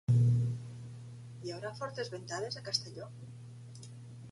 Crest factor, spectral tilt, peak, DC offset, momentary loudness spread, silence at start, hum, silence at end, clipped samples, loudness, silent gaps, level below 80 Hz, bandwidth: 20 dB; -5.5 dB/octave; -16 dBFS; under 0.1%; 20 LU; 0.1 s; none; 0 s; under 0.1%; -35 LUFS; none; -64 dBFS; 11.5 kHz